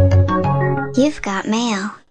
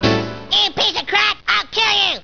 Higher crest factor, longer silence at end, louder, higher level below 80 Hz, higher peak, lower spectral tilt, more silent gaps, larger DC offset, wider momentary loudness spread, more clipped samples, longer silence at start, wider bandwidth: about the same, 14 dB vs 16 dB; about the same, 0 s vs 0.05 s; second, -18 LUFS vs -15 LUFS; first, -38 dBFS vs -44 dBFS; about the same, -2 dBFS vs 0 dBFS; first, -6.5 dB/octave vs -3 dB/octave; neither; neither; about the same, 6 LU vs 4 LU; neither; about the same, 0 s vs 0 s; first, 9 kHz vs 5.4 kHz